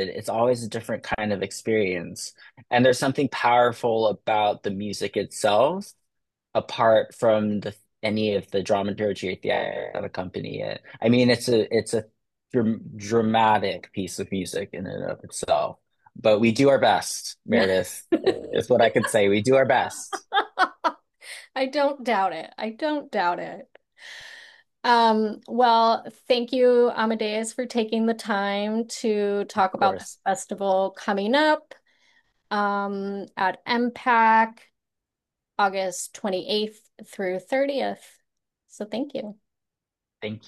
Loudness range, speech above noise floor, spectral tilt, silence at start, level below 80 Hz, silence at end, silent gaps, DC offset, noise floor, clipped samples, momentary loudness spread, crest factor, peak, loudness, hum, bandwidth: 6 LU; 64 dB; -4.5 dB/octave; 0 s; -66 dBFS; 0.1 s; none; under 0.1%; -87 dBFS; under 0.1%; 13 LU; 18 dB; -6 dBFS; -24 LUFS; none; 12.5 kHz